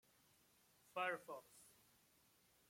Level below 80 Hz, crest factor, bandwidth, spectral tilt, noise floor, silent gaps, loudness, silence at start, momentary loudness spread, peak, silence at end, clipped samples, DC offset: under -90 dBFS; 22 dB; 16.5 kHz; -3 dB/octave; -76 dBFS; none; -48 LUFS; 0.95 s; 21 LU; -30 dBFS; 1 s; under 0.1%; under 0.1%